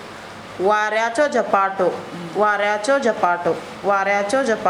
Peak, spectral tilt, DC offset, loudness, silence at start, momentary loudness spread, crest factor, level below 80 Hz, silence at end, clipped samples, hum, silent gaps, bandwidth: -2 dBFS; -4 dB/octave; under 0.1%; -19 LUFS; 0 s; 9 LU; 18 dB; -62 dBFS; 0 s; under 0.1%; none; none; 12.5 kHz